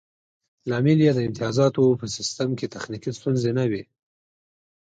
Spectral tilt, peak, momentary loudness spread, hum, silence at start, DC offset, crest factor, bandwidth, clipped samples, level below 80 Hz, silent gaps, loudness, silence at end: -6.5 dB/octave; -8 dBFS; 13 LU; none; 0.65 s; under 0.1%; 16 dB; 9.2 kHz; under 0.1%; -60 dBFS; none; -23 LUFS; 1.15 s